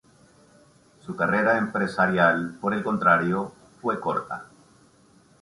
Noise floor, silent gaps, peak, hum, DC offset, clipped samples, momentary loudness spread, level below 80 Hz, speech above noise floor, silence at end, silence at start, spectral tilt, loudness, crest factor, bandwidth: -57 dBFS; none; -4 dBFS; none; under 0.1%; under 0.1%; 17 LU; -62 dBFS; 34 dB; 0.95 s; 1.05 s; -7 dB/octave; -23 LUFS; 20 dB; 11.5 kHz